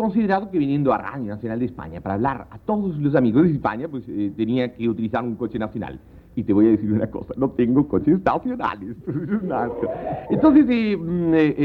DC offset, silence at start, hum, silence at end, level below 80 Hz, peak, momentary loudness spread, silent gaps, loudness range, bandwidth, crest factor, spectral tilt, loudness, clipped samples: under 0.1%; 0 s; none; 0 s; -48 dBFS; -4 dBFS; 12 LU; none; 3 LU; 4.7 kHz; 16 dB; -10 dB/octave; -21 LUFS; under 0.1%